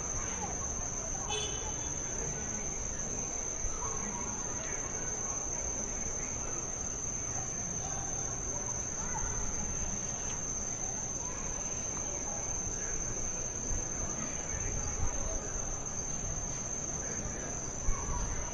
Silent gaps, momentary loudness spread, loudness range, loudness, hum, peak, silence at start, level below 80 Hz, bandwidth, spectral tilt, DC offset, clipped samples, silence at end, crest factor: none; 2 LU; 1 LU; -35 LUFS; none; -18 dBFS; 0 s; -44 dBFS; 11.5 kHz; -2.5 dB/octave; under 0.1%; under 0.1%; 0 s; 18 dB